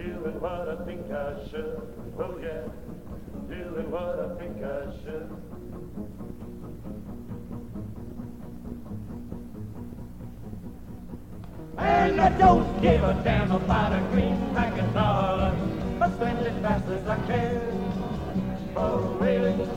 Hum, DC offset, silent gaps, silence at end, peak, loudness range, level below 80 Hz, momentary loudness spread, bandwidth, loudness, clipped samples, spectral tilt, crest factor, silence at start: none; 0.5%; none; 0 s; -6 dBFS; 17 LU; -40 dBFS; 18 LU; 16.5 kHz; -26 LUFS; under 0.1%; -8 dB/octave; 22 dB; 0 s